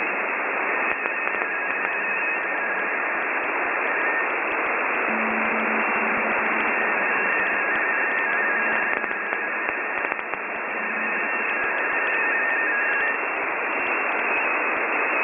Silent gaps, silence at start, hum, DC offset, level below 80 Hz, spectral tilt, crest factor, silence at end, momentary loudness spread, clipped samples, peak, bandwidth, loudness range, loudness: none; 0 s; none; under 0.1%; -68 dBFS; -1 dB/octave; 20 dB; 0 s; 4 LU; under 0.1%; -4 dBFS; 3.7 kHz; 2 LU; -22 LUFS